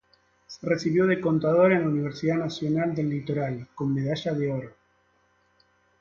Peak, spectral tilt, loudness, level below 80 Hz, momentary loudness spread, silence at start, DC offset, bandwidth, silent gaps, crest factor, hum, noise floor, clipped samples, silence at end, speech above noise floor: -8 dBFS; -7.5 dB/octave; -26 LUFS; -62 dBFS; 11 LU; 0.5 s; under 0.1%; 7.4 kHz; none; 18 dB; none; -66 dBFS; under 0.1%; 1.3 s; 41 dB